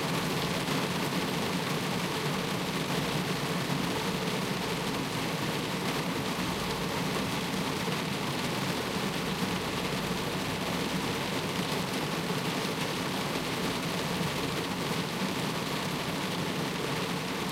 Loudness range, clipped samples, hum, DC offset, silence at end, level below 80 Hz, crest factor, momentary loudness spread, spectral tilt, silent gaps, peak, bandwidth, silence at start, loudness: 1 LU; under 0.1%; none; under 0.1%; 0 s; -54 dBFS; 16 dB; 1 LU; -4 dB/octave; none; -16 dBFS; 16 kHz; 0 s; -31 LUFS